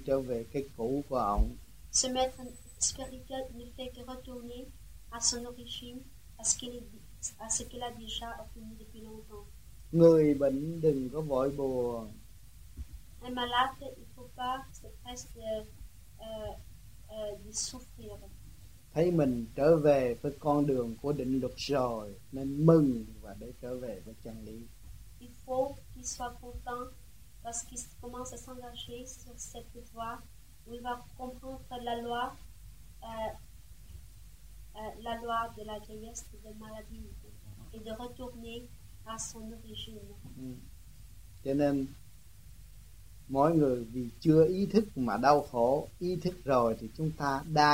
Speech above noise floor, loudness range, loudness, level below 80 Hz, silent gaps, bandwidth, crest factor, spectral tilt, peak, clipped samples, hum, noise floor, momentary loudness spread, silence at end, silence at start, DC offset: 22 dB; 14 LU; -32 LUFS; -50 dBFS; none; 16 kHz; 24 dB; -5 dB/octave; -10 dBFS; under 0.1%; none; -55 dBFS; 23 LU; 0 s; 0 s; 0.2%